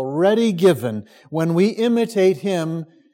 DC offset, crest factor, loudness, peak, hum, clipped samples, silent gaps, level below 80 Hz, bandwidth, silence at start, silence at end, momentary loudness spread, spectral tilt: under 0.1%; 16 dB; -19 LUFS; -2 dBFS; none; under 0.1%; none; -70 dBFS; 16.5 kHz; 0 s; 0.3 s; 11 LU; -6.5 dB/octave